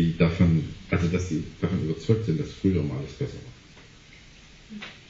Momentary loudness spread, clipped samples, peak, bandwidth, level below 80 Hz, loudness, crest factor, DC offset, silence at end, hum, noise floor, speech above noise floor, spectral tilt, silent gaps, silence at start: 18 LU; under 0.1%; -8 dBFS; 7.8 kHz; -46 dBFS; -26 LUFS; 18 dB; under 0.1%; 0.1 s; none; -50 dBFS; 23 dB; -7.5 dB/octave; none; 0 s